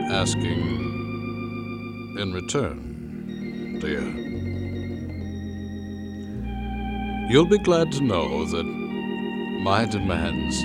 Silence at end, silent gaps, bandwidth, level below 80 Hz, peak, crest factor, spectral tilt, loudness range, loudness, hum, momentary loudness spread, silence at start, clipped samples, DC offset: 0 s; none; 15 kHz; -40 dBFS; -4 dBFS; 22 dB; -5.5 dB/octave; 8 LU; -26 LUFS; none; 13 LU; 0 s; under 0.1%; under 0.1%